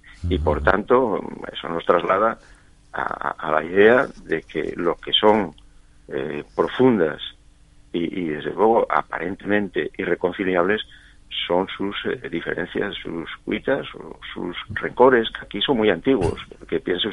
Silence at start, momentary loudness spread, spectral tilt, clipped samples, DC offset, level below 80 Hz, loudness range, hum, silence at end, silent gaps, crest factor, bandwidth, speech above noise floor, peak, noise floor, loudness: 0.05 s; 14 LU; -6.5 dB/octave; under 0.1%; under 0.1%; -42 dBFS; 5 LU; none; 0 s; none; 20 dB; 11 kHz; 29 dB; -2 dBFS; -50 dBFS; -22 LUFS